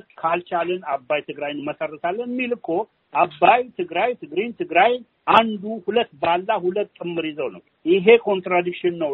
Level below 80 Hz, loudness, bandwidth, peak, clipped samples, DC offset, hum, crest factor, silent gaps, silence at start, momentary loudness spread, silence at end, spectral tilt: -66 dBFS; -21 LUFS; 4.7 kHz; 0 dBFS; under 0.1%; under 0.1%; none; 22 dB; none; 0.2 s; 11 LU; 0 s; -2.5 dB/octave